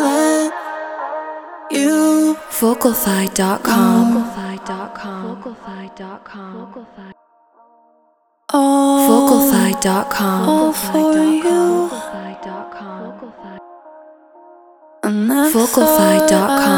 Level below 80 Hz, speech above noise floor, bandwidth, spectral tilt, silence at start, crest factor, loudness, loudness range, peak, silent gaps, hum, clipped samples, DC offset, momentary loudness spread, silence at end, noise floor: -52 dBFS; 43 dB; over 20 kHz; -4.5 dB/octave; 0 s; 16 dB; -15 LUFS; 16 LU; 0 dBFS; none; none; under 0.1%; under 0.1%; 21 LU; 0 s; -59 dBFS